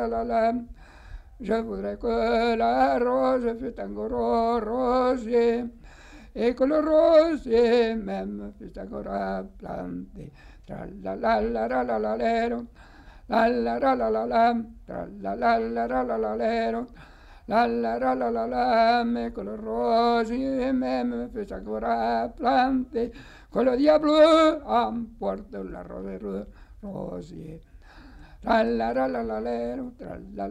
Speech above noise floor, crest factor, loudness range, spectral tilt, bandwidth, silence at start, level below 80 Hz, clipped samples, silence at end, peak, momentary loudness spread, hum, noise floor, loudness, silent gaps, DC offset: 23 dB; 18 dB; 7 LU; -6.5 dB/octave; 10.5 kHz; 0 s; -48 dBFS; under 0.1%; 0 s; -8 dBFS; 17 LU; none; -47 dBFS; -25 LUFS; none; under 0.1%